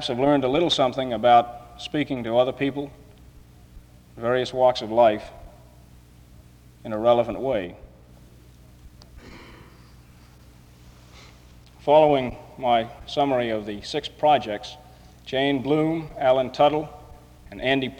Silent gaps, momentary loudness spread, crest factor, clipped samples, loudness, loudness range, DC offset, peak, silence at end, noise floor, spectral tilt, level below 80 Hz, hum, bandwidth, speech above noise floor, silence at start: none; 16 LU; 18 dB; under 0.1%; -22 LUFS; 6 LU; under 0.1%; -6 dBFS; 0.05 s; -50 dBFS; -6 dB/octave; -50 dBFS; none; 11.5 kHz; 28 dB; 0 s